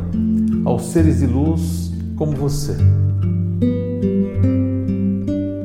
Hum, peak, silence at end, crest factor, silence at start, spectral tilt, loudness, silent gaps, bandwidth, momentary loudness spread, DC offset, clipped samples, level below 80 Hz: none; -4 dBFS; 0 s; 14 dB; 0 s; -8.5 dB/octave; -18 LUFS; none; 14.5 kHz; 6 LU; under 0.1%; under 0.1%; -32 dBFS